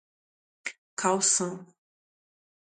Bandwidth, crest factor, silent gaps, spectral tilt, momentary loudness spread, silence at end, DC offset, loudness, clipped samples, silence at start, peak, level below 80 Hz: 9.6 kHz; 22 dB; 0.78-0.97 s; -2 dB/octave; 17 LU; 1 s; under 0.1%; -26 LUFS; under 0.1%; 0.65 s; -10 dBFS; -82 dBFS